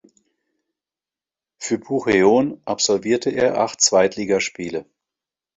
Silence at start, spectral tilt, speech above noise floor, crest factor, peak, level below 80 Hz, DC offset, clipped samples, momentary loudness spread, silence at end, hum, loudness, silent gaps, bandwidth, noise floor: 1.6 s; -3 dB/octave; over 71 dB; 20 dB; -2 dBFS; -58 dBFS; under 0.1%; under 0.1%; 12 LU; 0.75 s; none; -19 LUFS; none; 8.2 kHz; under -90 dBFS